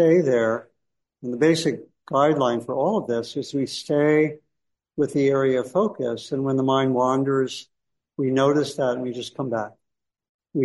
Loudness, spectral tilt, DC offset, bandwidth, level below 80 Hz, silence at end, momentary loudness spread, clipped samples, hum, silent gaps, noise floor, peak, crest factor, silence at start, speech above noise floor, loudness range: -23 LUFS; -6 dB/octave; under 0.1%; 11.5 kHz; -66 dBFS; 0 s; 11 LU; under 0.1%; none; 10.29-10.39 s; -80 dBFS; -6 dBFS; 16 dB; 0 s; 59 dB; 2 LU